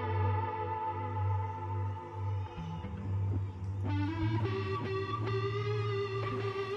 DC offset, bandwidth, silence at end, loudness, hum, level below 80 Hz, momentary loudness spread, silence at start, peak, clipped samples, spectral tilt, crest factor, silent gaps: under 0.1%; 6.4 kHz; 0 s; -35 LUFS; none; -56 dBFS; 6 LU; 0 s; -22 dBFS; under 0.1%; -8 dB/octave; 14 dB; none